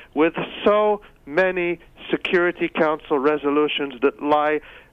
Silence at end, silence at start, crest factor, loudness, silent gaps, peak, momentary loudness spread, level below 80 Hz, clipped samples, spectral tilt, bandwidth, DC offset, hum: 0.15 s; 0 s; 14 dB; -21 LUFS; none; -6 dBFS; 7 LU; -54 dBFS; under 0.1%; -7 dB/octave; 6.2 kHz; under 0.1%; none